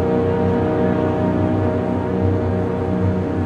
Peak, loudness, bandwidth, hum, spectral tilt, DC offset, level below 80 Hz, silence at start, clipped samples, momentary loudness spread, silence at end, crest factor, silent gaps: -6 dBFS; -19 LUFS; 6.8 kHz; none; -9.5 dB/octave; under 0.1%; -40 dBFS; 0 s; under 0.1%; 3 LU; 0 s; 12 dB; none